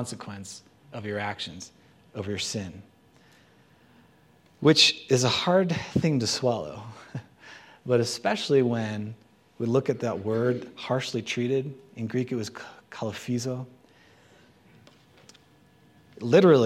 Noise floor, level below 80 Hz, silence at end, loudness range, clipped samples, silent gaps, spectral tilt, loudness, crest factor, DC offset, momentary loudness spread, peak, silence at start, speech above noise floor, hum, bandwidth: -59 dBFS; -66 dBFS; 0 s; 13 LU; under 0.1%; none; -4.5 dB/octave; -26 LUFS; 22 dB; under 0.1%; 21 LU; -6 dBFS; 0 s; 33 dB; none; 15.5 kHz